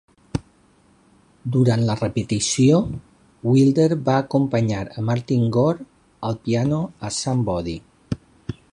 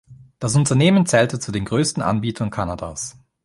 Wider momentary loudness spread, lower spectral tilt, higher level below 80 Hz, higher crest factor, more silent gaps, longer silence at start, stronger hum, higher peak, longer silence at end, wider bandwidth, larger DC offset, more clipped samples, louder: about the same, 15 LU vs 13 LU; first, -6.5 dB/octave vs -5 dB/octave; about the same, -46 dBFS vs -46 dBFS; about the same, 16 dB vs 18 dB; neither; first, 0.35 s vs 0.1 s; neither; about the same, -4 dBFS vs -2 dBFS; second, 0.2 s vs 0.35 s; about the same, 11.5 kHz vs 11.5 kHz; neither; neither; about the same, -21 LUFS vs -19 LUFS